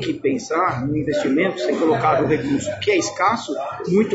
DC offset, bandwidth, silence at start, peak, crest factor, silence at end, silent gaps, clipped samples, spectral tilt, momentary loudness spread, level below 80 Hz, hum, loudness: under 0.1%; 8 kHz; 0 s; -6 dBFS; 14 dB; 0 s; none; under 0.1%; -5.5 dB/octave; 5 LU; -52 dBFS; none; -20 LUFS